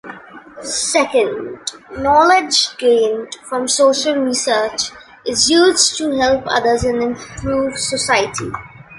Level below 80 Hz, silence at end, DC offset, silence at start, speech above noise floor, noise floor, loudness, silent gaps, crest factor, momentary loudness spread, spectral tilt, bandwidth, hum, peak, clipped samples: -44 dBFS; 0 s; under 0.1%; 0.05 s; 20 dB; -36 dBFS; -15 LUFS; none; 16 dB; 15 LU; -2 dB/octave; 11.5 kHz; none; 0 dBFS; under 0.1%